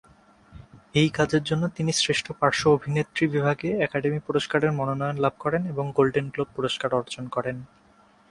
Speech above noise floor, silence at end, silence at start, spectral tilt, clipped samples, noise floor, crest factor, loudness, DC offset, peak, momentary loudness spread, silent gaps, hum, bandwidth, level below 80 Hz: 33 dB; 0.65 s; 0.55 s; -5 dB/octave; under 0.1%; -58 dBFS; 20 dB; -25 LUFS; under 0.1%; -4 dBFS; 7 LU; none; none; 11.5 kHz; -56 dBFS